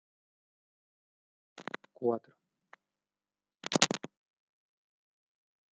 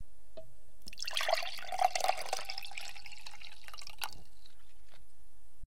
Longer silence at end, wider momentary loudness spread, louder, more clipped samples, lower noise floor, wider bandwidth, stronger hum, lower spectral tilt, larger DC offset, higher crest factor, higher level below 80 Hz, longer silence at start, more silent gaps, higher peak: first, 1.7 s vs 0 s; second, 18 LU vs 22 LU; first, -33 LUFS vs -37 LUFS; neither; first, under -90 dBFS vs -63 dBFS; second, 9 kHz vs 16.5 kHz; neither; first, -2.5 dB/octave vs -0.5 dB/octave; second, under 0.1% vs 2%; first, 38 dB vs 28 dB; second, -82 dBFS vs -62 dBFS; first, 1.55 s vs 0.1 s; neither; first, -2 dBFS vs -12 dBFS